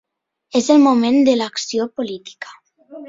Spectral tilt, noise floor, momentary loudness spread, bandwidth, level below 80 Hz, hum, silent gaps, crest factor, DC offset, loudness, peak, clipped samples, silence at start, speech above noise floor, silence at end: -4 dB/octave; -52 dBFS; 21 LU; 7.8 kHz; -64 dBFS; none; none; 16 dB; under 0.1%; -16 LUFS; -2 dBFS; under 0.1%; 0.55 s; 36 dB; 0 s